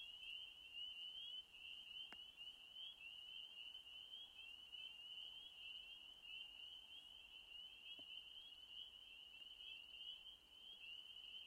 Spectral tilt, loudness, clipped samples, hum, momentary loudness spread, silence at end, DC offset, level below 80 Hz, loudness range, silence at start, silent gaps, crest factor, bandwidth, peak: 0 dB/octave; -55 LUFS; under 0.1%; none; 5 LU; 0 s; under 0.1%; -84 dBFS; 3 LU; 0 s; none; 18 dB; 16 kHz; -40 dBFS